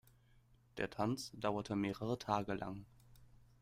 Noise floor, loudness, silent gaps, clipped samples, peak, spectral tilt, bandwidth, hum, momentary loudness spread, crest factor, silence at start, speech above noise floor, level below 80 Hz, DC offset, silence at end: -69 dBFS; -41 LUFS; none; under 0.1%; -20 dBFS; -6 dB/octave; 16 kHz; none; 9 LU; 22 dB; 0.75 s; 29 dB; -66 dBFS; under 0.1%; 0.35 s